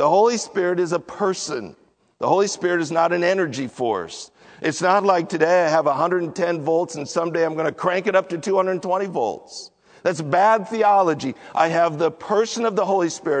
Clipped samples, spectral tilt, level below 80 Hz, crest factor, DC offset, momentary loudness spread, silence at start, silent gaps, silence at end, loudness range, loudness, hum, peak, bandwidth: under 0.1%; -4.5 dB/octave; -70 dBFS; 18 dB; under 0.1%; 10 LU; 0 s; none; 0 s; 3 LU; -21 LUFS; none; -4 dBFS; 9.4 kHz